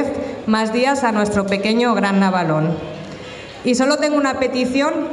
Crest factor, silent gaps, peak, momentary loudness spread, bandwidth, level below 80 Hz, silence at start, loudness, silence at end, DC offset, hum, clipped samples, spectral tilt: 14 dB; none; -4 dBFS; 12 LU; 11.5 kHz; -52 dBFS; 0 s; -18 LUFS; 0 s; under 0.1%; none; under 0.1%; -5.5 dB/octave